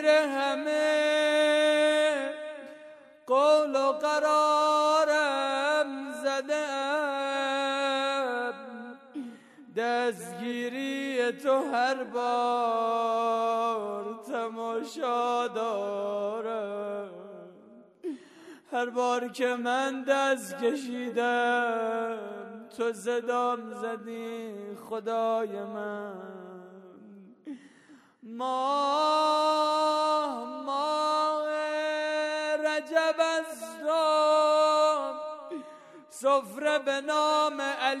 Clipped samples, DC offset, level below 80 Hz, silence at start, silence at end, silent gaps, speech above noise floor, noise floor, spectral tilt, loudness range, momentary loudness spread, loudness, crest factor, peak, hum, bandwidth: under 0.1%; under 0.1%; under -90 dBFS; 0 s; 0 s; none; 29 dB; -57 dBFS; -2.5 dB/octave; 8 LU; 17 LU; -28 LUFS; 18 dB; -10 dBFS; none; 13.5 kHz